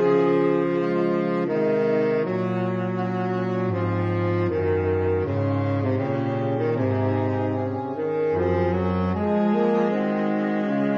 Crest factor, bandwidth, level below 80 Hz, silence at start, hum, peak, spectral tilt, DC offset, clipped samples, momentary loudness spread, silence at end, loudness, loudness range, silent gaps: 14 dB; 7 kHz; -54 dBFS; 0 s; none; -10 dBFS; -9.5 dB/octave; under 0.1%; under 0.1%; 4 LU; 0 s; -23 LUFS; 1 LU; none